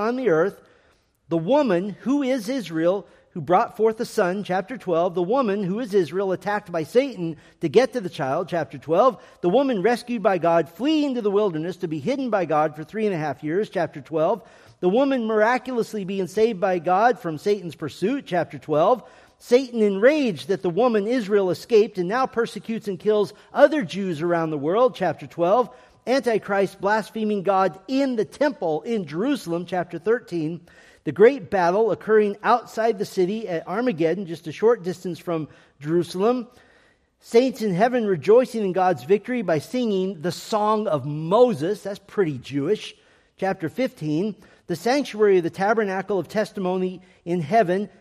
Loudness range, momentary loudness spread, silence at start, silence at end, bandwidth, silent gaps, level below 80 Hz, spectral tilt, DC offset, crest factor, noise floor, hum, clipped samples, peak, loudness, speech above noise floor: 3 LU; 9 LU; 0 s; 0.15 s; 15 kHz; none; -66 dBFS; -6.5 dB/octave; under 0.1%; 20 dB; -61 dBFS; none; under 0.1%; -2 dBFS; -23 LUFS; 39 dB